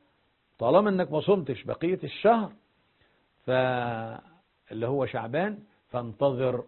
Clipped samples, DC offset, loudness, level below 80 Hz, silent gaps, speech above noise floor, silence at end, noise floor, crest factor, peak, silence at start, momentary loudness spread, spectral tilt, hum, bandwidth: under 0.1%; under 0.1%; -27 LUFS; -64 dBFS; none; 43 dB; 0 s; -70 dBFS; 22 dB; -6 dBFS; 0.6 s; 15 LU; -11 dB/octave; none; 4.3 kHz